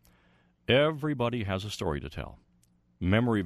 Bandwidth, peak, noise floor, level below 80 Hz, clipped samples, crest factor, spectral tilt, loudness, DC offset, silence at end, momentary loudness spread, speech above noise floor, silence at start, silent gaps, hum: 13.5 kHz; -10 dBFS; -67 dBFS; -50 dBFS; under 0.1%; 20 dB; -6.5 dB/octave; -29 LUFS; under 0.1%; 0 s; 17 LU; 38 dB; 0.7 s; none; 60 Hz at -55 dBFS